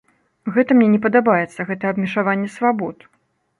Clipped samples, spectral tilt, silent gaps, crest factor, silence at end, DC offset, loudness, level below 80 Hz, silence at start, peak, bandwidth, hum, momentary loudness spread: under 0.1%; -8 dB/octave; none; 16 dB; 0.65 s; under 0.1%; -18 LUFS; -64 dBFS; 0.45 s; -2 dBFS; 11 kHz; none; 11 LU